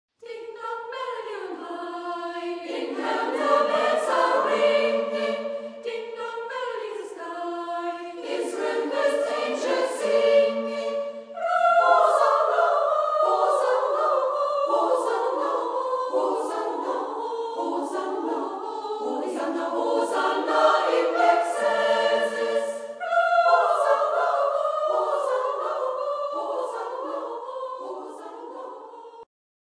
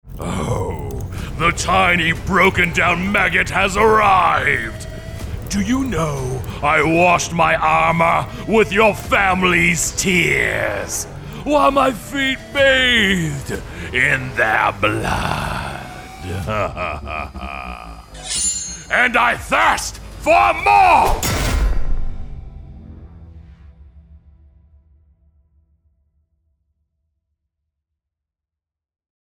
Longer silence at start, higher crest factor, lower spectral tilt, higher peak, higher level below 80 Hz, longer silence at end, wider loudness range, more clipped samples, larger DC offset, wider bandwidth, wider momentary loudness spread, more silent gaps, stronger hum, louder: first, 0.25 s vs 0.05 s; about the same, 18 dB vs 16 dB; second, -2.5 dB/octave vs -4 dB/octave; second, -6 dBFS vs -2 dBFS; second, -86 dBFS vs -30 dBFS; second, 0.35 s vs 5.1 s; about the same, 9 LU vs 8 LU; neither; neither; second, 10.5 kHz vs over 20 kHz; about the same, 14 LU vs 16 LU; neither; neither; second, -24 LUFS vs -16 LUFS